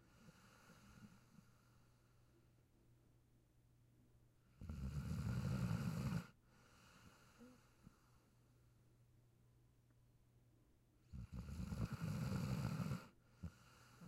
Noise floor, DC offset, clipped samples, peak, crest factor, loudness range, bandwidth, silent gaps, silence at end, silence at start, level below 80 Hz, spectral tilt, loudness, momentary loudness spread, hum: -74 dBFS; under 0.1%; under 0.1%; -30 dBFS; 20 dB; 21 LU; 16 kHz; none; 0 s; 0.15 s; -62 dBFS; -7 dB/octave; -47 LUFS; 23 LU; none